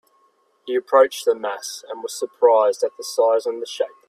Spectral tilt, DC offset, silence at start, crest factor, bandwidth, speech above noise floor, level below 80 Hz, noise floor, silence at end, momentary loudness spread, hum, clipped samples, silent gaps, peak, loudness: -1 dB/octave; under 0.1%; 0.65 s; 18 dB; 14.5 kHz; 42 dB; -74 dBFS; -62 dBFS; 0.2 s; 14 LU; none; under 0.1%; none; -2 dBFS; -20 LUFS